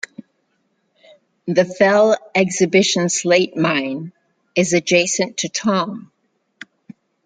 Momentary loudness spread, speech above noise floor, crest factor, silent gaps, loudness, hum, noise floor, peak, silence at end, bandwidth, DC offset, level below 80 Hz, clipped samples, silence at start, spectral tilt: 13 LU; 50 dB; 18 dB; none; -17 LUFS; none; -67 dBFS; -2 dBFS; 1.25 s; 9.6 kHz; under 0.1%; -64 dBFS; under 0.1%; 1.45 s; -3.5 dB/octave